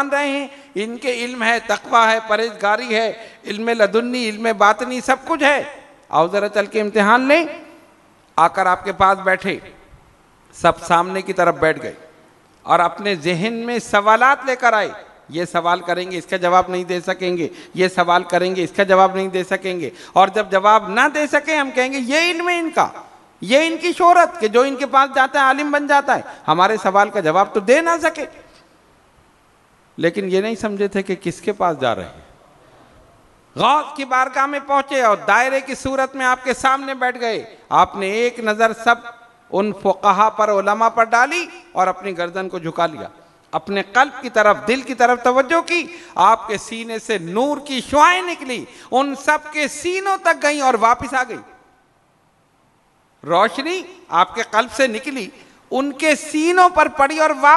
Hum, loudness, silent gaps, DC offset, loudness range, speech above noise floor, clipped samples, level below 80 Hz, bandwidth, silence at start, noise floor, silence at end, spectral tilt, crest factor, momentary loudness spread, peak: none; -17 LUFS; none; under 0.1%; 5 LU; 41 dB; under 0.1%; -54 dBFS; 12 kHz; 0 s; -58 dBFS; 0 s; -4 dB/octave; 18 dB; 11 LU; 0 dBFS